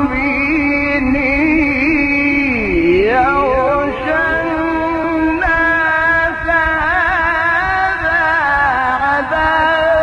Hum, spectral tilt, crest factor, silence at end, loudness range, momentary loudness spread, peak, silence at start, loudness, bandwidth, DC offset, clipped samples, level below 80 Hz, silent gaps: none; -6.5 dB/octave; 12 dB; 0 s; 1 LU; 3 LU; -2 dBFS; 0 s; -13 LUFS; 10 kHz; under 0.1%; under 0.1%; -32 dBFS; none